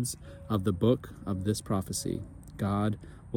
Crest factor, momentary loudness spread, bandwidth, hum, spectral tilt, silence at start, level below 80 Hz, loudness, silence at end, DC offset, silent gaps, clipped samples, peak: 18 dB; 11 LU; 17.5 kHz; none; -6 dB/octave; 0 s; -52 dBFS; -31 LUFS; 0 s; under 0.1%; none; under 0.1%; -12 dBFS